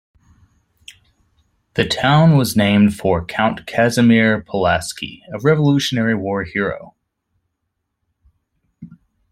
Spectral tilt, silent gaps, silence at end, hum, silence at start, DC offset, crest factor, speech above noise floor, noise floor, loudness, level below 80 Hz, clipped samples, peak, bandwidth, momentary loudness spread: -6 dB/octave; none; 0.45 s; none; 0.9 s; under 0.1%; 18 dB; 59 dB; -75 dBFS; -16 LUFS; -48 dBFS; under 0.1%; -2 dBFS; 15.5 kHz; 11 LU